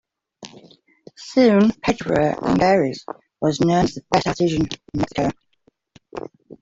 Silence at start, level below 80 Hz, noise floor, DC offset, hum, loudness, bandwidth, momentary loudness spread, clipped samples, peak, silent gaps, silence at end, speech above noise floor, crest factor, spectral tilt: 0.4 s; -48 dBFS; -63 dBFS; under 0.1%; none; -19 LUFS; 8 kHz; 21 LU; under 0.1%; -2 dBFS; none; 0.1 s; 44 dB; 18 dB; -6 dB/octave